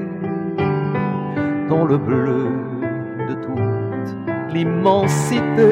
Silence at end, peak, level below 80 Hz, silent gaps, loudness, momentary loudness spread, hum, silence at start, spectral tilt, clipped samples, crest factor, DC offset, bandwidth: 0 s; -2 dBFS; -54 dBFS; none; -20 LUFS; 9 LU; none; 0 s; -7 dB/octave; under 0.1%; 16 dB; under 0.1%; 16 kHz